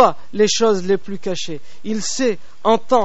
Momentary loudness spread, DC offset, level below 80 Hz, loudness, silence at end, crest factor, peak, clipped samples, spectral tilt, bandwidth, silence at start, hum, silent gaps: 11 LU; 6%; -58 dBFS; -19 LUFS; 0 s; 18 dB; 0 dBFS; under 0.1%; -3.5 dB/octave; 8 kHz; 0 s; none; none